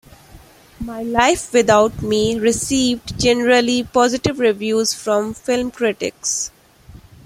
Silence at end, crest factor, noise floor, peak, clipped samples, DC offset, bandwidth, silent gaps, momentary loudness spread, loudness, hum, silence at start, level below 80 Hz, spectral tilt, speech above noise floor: 0.3 s; 16 dB; -44 dBFS; -2 dBFS; under 0.1%; under 0.1%; 16 kHz; none; 7 LU; -17 LUFS; none; 0.35 s; -44 dBFS; -3.5 dB/octave; 27 dB